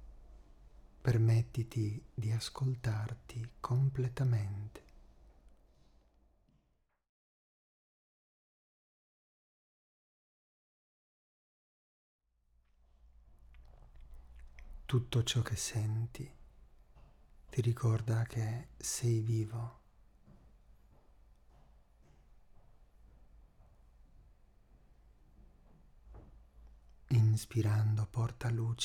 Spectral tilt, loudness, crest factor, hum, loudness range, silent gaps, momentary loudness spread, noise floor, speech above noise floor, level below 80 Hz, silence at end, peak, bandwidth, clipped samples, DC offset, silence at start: -5.5 dB/octave; -35 LUFS; 20 dB; none; 7 LU; 7.09-12.19 s; 14 LU; -77 dBFS; 43 dB; -58 dBFS; 0 s; -18 dBFS; 14 kHz; under 0.1%; under 0.1%; 0 s